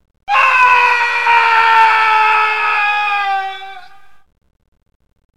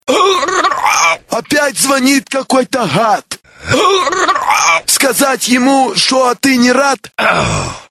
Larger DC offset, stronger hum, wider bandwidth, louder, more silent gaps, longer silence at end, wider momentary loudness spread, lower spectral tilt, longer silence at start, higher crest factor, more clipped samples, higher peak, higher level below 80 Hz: first, 1% vs under 0.1%; neither; about the same, 13 kHz vs 13.5 kHz; about the same, -11 LUFS vs -11 LUFS; neither; first, 1.55 s vs 0.1 s; first, 10 LU vs 5 LU; second, 0.5 dB/octave vs -2.5 dB/octave; first, 0.25 s vs 0.05 s; about the same, 14 dB vs 12 dB; neither; about the same, 0 dBFS vs 0 dBFS; second, -52 dBFS vs -42 dBFS